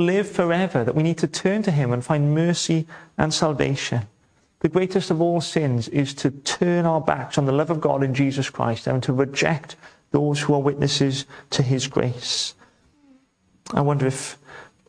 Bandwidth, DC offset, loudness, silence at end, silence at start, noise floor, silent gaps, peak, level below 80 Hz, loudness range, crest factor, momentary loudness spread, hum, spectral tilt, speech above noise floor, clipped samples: 10.5 kHz; under 0.1%; -22 LUFS; 0.25 s; 0 s; -62 dBFS; none; -2 dBFS; -54 dBFS; 3 LU; 20 dB; 6 LU; none; -5.5 dB/octave; 40 dB; under 0.1%